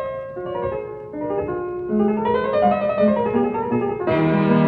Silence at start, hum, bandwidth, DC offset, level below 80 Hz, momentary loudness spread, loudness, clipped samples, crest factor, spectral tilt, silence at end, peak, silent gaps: 0 s; none; 4.9 kHz; under 0.1%; -48 dBFS; 10 LU; -21 LUFS; under 0.1%; 16 dB; -10.5 dB/octave; 0 s; -4 dBFS; none